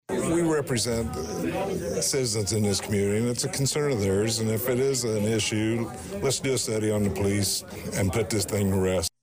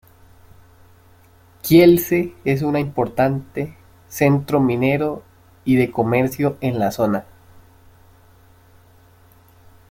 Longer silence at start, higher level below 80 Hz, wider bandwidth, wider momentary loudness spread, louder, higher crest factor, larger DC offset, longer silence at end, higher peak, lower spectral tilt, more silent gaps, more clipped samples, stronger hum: second, 0.1 s vs 1.65 s; about the same, -48 dBFS vs -52 dBFS; about the same, 16 kHz vs 16.5 kHz; second, 5 LU vs 16 LU; second, -26 LUFS vs -18 LUFS; second, 10 dB vs 18 dB; neither; second, 0.15 s vs 2.7 s; second, -16 dBFS vs -2 dBFS; second, -4.5 dB/octave vs -7 dB/octave; neither; neither; neither